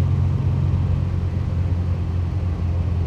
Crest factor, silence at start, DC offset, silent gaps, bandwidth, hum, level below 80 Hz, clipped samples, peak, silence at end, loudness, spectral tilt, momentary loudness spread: 10 dB; 0 s; under 0.1%; none; 5.8 kHz; none; -30 dBFS; under 0.1%; -10 dBFS; 0 s; -22 LUFS; -9.5 dB/octave; 3 LU